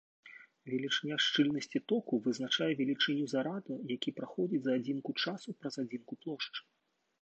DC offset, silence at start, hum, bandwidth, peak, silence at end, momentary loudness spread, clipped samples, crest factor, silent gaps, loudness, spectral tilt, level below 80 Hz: under 0.1%; 0.25 s; none; 8.6 kHz; -18 dBFS; 0.6 s; 12 LU; under 0.1%; 18 dB; none; -35 LUFS; -4.5 dB/octave; -84 dBFS